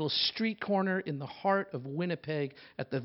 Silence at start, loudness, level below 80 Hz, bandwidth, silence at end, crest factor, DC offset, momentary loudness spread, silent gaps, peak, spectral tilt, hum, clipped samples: 0 s; -33 LUFS; -76 dBFS; 5.8 kHz; 0 s; 18 dB; under 0.1%; 9 LU; none; -14 dBFS; -9 dB/octave; none; under 0.1%